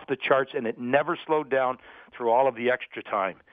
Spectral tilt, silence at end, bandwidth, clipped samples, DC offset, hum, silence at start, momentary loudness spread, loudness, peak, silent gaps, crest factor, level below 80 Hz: -8 dB/octave; 0.2 s; 4.8 kHz; under 0.1%; under 0.1%; none; 0 s; 8 LU; -26 LUFS; -8 dBFS; none; 18 dB; -72 dBFS